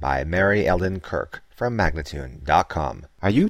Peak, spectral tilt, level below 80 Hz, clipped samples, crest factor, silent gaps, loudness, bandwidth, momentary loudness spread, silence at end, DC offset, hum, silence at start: -4 dBFS; -7 dB/octave; -36 dBFS; under 0.1%; 18 dB; none; -23 LUFS; 15.5 kHz; 12 LU; 0 s; 0.1%; none; 0 s